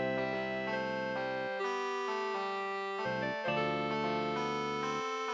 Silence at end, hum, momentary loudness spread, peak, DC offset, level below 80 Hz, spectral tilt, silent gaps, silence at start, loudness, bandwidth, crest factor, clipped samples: 0 s; none; 3 LU; -22 dBFS; under 0.1%; -68 dBFS; -5 dB/octave; none; 0 s; -35 LUFS; 8 kHz; 14 dB; under 0.1%